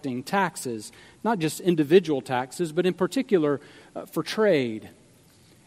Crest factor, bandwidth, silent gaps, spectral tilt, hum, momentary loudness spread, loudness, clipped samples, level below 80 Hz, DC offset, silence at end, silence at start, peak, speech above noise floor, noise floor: 20 dB; 16 kHz; none; -5.5 dB/octave; none; 14 LU; -25 LUFS; under 0.1%; -70 dBFS; under 0.1%; 0.75 s; 0.05 s; -6 dBFS; 31 dB; -56 dBFS